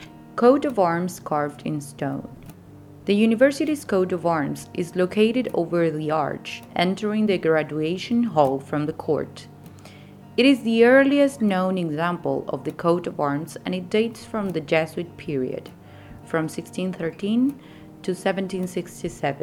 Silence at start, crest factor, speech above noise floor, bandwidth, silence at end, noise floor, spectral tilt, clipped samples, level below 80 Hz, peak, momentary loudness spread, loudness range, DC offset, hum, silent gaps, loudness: 0 s; 18 dB; 22 dB; 17 kHz; 0 s; -45 dBFS; -6 dB/octave; under 0.1%; -60 dBFS; -4 dBFS; 12 LU; 6 LU; under 0.1%; none; none; -23 LUFS